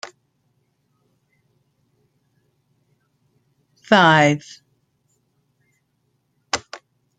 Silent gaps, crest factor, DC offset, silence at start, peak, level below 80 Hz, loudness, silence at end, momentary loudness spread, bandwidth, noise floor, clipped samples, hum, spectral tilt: none; 22 dB; under 0.1%; 0.05 s; -2 dBFS; -66 dBFS; -17 LUFS; 0.45 s; 28 LU; 9.4 kHz; -69 dBFS; under 0.1%; 60 Hz at -60 dBFS; -4.5 dB/octave